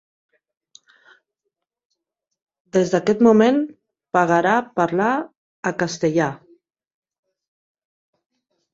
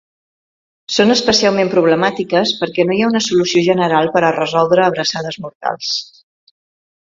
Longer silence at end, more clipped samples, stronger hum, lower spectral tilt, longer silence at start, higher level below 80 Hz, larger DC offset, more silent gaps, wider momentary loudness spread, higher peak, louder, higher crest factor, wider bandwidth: first, 2.4 s vs 1.15 s; neither; neither; first, -6 dB/octave vs -4 dB/octave; first, 2.75 s vs 0.9 s; second, -64 dBFS vs -56 dBFS; neither; first, 5.37-5.63 s vs 5.55-5.60 s; first, 12 LU vs 9 LU; about the same, -2 dBFS vs 0 dBFS; second, -19 LUFS vs -14 LUFS; about the same, 20 dB vs 16 dB; about the same, 7.8 kHz vs 7.8 kHz